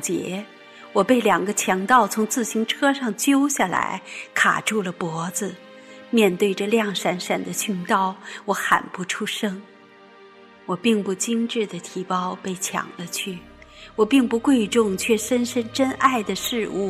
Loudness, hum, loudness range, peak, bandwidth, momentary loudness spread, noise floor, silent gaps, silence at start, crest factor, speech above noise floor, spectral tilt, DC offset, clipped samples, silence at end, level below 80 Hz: -22 LUFS; none; 5 LU; -4 dBFS; 15.5 kHz; 11 LU; -48 dBFS; none; 0 s; 20 dB; 26 dB; -3.5 dB/octave; under 0.1%; under 0.1%; 0 s; -60 dBFS